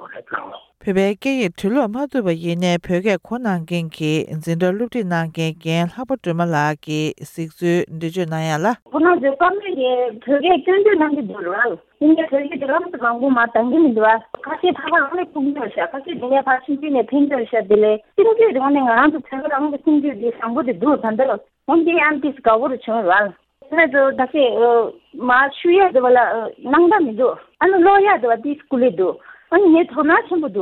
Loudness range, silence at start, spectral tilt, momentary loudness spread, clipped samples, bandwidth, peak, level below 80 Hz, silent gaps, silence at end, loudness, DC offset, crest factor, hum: 5 LU; 0 s; -6.5 dB/octave; 9 LU; under 0.1%; 13 kHz; -2 dBFS; -58 dBFS; 8.82-8.86 s; 0 s; -17 LUFS; under 0.1%; 14 dB; none